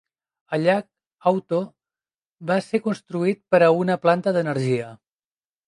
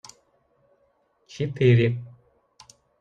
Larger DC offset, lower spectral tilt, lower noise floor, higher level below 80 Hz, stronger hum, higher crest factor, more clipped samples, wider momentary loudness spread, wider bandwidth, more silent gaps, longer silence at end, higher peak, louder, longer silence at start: neither; about the same, -7 dB/octave vs -7.5 dB/octave; first, under -90 dBFS vs -67 dBFS; second, -72 dBFS vs -60 dBFS; neither; about the same, 20 dB vs 18 dB; neither; second, 9 LU vs 27 LU; first, 11 kHz vs 7.8 kHz; first, 2.32-2.36 s vs none; second, 0.75 s vs 0.9 s; first, -4 dBFS vs -8 dBFS; about the same, -22 LUFS vs -22 LUFS; second, 0.5 s vs 1.35 s